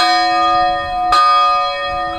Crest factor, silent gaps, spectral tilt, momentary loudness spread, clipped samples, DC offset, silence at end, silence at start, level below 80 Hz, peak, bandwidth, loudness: 14 dB; none; -2.5 dB/octave; 7 LU; under 0.1%; under 0.1%; 0 s; 0 s; -40 dBFS; 0 dBFS; 13 kHz; -13 LUFS